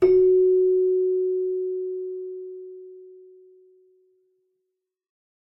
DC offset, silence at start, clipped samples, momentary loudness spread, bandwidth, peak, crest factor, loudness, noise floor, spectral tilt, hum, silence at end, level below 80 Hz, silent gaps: under 0.1%; 0 s; under 0.1%; 23 LU; 2.8 kHz; -8 dBFS; 16 dB; -22 LUFS; -81 dBFS; -8.5 dB/octave; none; 2.45 s; -60 dBFS; none